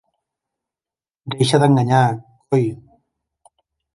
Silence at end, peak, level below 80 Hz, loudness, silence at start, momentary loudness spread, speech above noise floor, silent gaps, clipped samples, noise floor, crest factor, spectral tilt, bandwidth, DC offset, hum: 1.2 s; -2 dBFS; -60 dBFS; -17 LUFS; 1.25 s; 17 LU; over 74 dB; none; under 0.1%; under -90 dBFS; 18 dB; -6.5 dB/octave; 11.5 kHz; under 0.1%; none